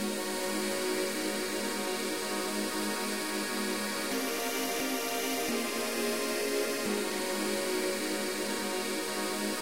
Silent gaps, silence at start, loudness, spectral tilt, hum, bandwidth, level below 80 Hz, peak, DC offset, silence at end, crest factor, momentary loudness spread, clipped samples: none; 0 s; -32 LUFS; -2 dB/octave; none; 16 kHz; -68 dBFS; -18 dBFS; 0.3%; 0 s; 14 dB; 2 LU; under 0.1%